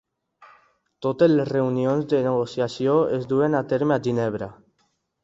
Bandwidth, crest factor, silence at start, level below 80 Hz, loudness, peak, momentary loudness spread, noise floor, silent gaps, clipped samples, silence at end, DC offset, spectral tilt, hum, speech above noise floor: 7.8 kHz; 18 dB; 0.4 s; -62 dBFS; -22 LUFS; -6 dBFS; 9 LU; -70 dBFS; none; under 0.1%; 0.7 s; under 0.1%; -8 dB/octave; none; 48 dB